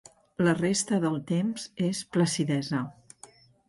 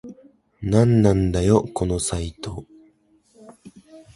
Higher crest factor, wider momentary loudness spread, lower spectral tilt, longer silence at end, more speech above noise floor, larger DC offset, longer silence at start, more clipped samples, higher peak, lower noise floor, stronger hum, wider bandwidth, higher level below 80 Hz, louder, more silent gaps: about the same, 14 dB vs 18 dB; second, 7 LU vs 17 LU; second, -5 dB/octave vs -6.5 dB/octave; first, 0.75 s vs 0.15 s; second, 27 dB vs 40 dB; neither; first, 0.4 s vs 0.05 s; neither; second, -14 dBFS vs -4 dBFS; second, -54 dBFS vs -59 dBFS; neither; about the same, 11.5 kHz vs 11.5 kHz; second, -66 dBFS vs -38 dBFS; second, -28 LUFS vs -20 LUFS; neither